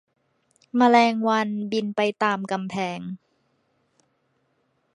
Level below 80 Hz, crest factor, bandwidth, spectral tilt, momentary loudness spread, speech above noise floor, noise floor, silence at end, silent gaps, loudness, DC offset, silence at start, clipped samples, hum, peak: -74 dBFS; 20 dB; 10.5 kHz; -5.5 dB/octave; 14 LU; 48 dB; -70 dBFS; 1.8 s; none; -23 LUFS; under 0.1%; 0.75 s; under 0.1%; none; -4 dBFS